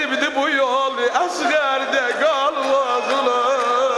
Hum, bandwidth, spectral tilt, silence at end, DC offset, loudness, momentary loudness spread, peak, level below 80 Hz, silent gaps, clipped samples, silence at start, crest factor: none; 12.5 kHz; -1 dB/octave; 0 s; under 0.1%; -18 LUFS; 2 LU; -6 dBFS; -66 dBFS; none; under 0.1%; 0 s; 14 dB